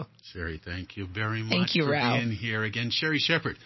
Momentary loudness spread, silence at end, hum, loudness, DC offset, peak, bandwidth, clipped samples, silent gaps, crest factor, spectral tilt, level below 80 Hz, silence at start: 13 LU; 0 s; none; -28 LUFS; under 0.1%; -8 dBFS; 6.2 kHz; under 0.1%; none; 20 dB; -5.5 dB/octave; -50 dBFS; 0 s